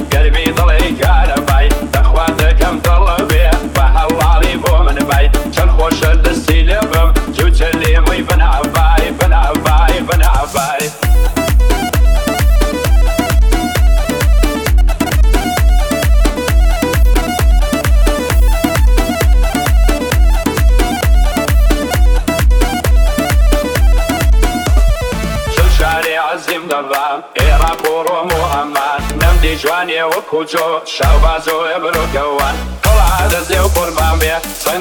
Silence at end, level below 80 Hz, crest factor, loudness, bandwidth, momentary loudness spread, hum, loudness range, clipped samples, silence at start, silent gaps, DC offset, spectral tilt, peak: 0 s; -12 dBFS; 10 dB; -13 LUFS; 19.5 kHz; 4 LU; none; 2 LU; under 0.1%; 0 s; none; under 0.1%; -5 dB/octave; 0 dBFS